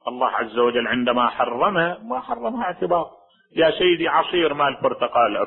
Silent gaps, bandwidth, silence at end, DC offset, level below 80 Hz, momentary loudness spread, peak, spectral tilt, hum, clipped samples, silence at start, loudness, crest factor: none; 4.2 kHz; 0 s; under 0.1%; -56 dBFS; 8 LU; -6 dBFS; -9.5 dB/octave; none; under 0.1%; 0.05 s; -21 LUFS; 16 dB